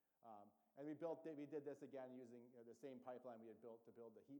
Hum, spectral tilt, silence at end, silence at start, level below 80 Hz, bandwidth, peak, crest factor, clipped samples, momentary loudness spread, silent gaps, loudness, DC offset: none; -7.5 dB/octave; 0 s; 0.2 s; under -90 dBFS; 19.5 kHz; -40 dBFS; 18 dB; under 0.1%; 13 LU; none; -57 LUFS; under 0.1%